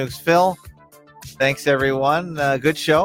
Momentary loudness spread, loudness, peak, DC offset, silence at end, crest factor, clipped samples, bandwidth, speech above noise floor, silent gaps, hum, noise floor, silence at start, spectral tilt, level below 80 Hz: 4 LU; -19 LUFS; -4 dBFS; under 0.1%; 0 s; 16 dB; under 0.1%; 17 kHz; 29 dB; none; none; -48 dBFS; 0 s; -5 dB/octave; -50 dBFS